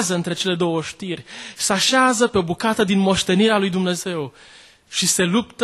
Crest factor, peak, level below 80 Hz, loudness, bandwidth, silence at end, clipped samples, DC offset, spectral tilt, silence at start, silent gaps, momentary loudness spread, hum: 16 dB; -4 dBFS; -52 dBFS; -19 LUFS; 12.5 kHz; 0 s; under 0.1%; under 0.1%; -3.5 dB/octave; 0 s; none; 13 LU; none